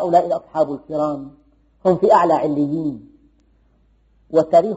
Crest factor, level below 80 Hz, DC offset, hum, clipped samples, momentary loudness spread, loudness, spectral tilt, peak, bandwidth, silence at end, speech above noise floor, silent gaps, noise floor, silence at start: 16 dB; -56 dBFS; under 0.1%; none; under 0.1%; 13 LU; -18 LUFS; -6.5 dB/octave; -2 dBFS; 8 kHz; 0 s; 40 dB; none; -57 dBFS; 0 s